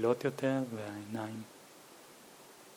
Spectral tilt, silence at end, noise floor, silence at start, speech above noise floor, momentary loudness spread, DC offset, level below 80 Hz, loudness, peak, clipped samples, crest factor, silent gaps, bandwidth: -6 dB/octave; 0 s; -56 dBFS; 0 s; 21 dB; 22 LU; under 0.1%; -84 dBFS; -37 LUFS; -18 dBFS; under 0.1%; 20 dB; none; 19.5 kHz